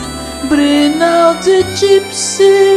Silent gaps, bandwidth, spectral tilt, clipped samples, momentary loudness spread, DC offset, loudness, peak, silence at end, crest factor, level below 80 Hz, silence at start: none; 13.5 kHz; -3.5 dB/octave; under 0.1%; 6 LU; under 0.1%; -10 LUFS; 0 dBFS; 0 s; 10 dB; -38 dBFS; 0 s